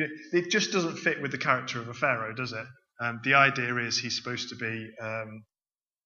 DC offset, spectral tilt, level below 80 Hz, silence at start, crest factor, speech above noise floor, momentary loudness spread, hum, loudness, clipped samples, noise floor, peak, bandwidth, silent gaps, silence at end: under 0.1%; -3.5 dB/octave; -76 dBFS; 0 s; 24 dB; over 61 dB; 13 LU; none; -28 LUFS; under 0.1%; under -90 dBFS; -6 dBFS; 7.4 kHz; none; 0.65 s